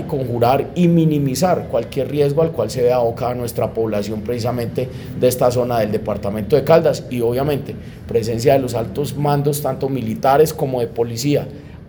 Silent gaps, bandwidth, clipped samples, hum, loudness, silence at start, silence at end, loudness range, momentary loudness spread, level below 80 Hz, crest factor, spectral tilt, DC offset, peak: none; over 20 kHz; under 0.1%; none; -18 LUFS; 0 s; 0 s; 2 LU; 8 LU; -44 dBFS; 18 dB; -6.5 dB/octave; under 0.1%; 0 dBFS